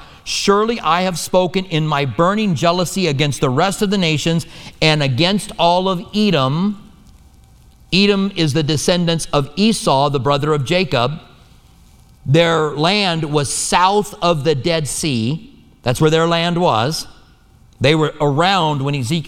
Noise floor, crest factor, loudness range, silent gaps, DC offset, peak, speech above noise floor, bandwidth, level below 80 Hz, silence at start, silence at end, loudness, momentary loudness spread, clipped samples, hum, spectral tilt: -48 dBFS; 16 dB; 2 LU; none; under 0.1%; 0 dBFS; 32 dB; 16.5 kHz; -42 dBFS; 0 s; 0 s; -16 LUFS; 6 LU; under 0.1%; none; -5 dB/octave